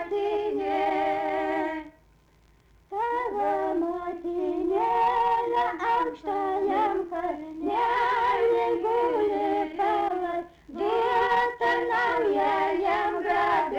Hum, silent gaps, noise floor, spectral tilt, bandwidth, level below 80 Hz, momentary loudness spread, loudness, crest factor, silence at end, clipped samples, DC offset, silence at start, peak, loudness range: none; none; -60 dBFS; -5 dB/octave; 11.5 kHz; -58 dBFS; 8 LU; -26 LUFS; 12 dB; 0 s; under 0.1%; under 0.1%; 0 s; -14 dBFS; 4 LU